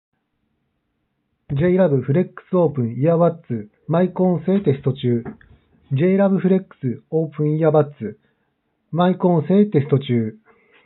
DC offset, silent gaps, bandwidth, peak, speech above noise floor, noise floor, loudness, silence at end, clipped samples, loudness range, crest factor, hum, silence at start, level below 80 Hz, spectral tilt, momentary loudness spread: under 0.1%; none; 4.1 kHz; -4 dBFS; 53 dB; -72 dBFS; -19 LUFS; 0.55 s; under 0.1%; 1 LU; 16 dB; none; 1.5 s; -58 dBFS; -8.5 dB/octave; 12 LU